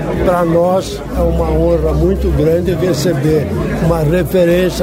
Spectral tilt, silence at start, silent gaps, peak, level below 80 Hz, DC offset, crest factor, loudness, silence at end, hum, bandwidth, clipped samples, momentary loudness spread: -7 dB/octave; 0 s; none; 0 dBFS; -22 dBFS; under 0.1%; 12 dB; -14 LUFS; 0 s; none; 16.5 kHz; under 0.1%; 4 LU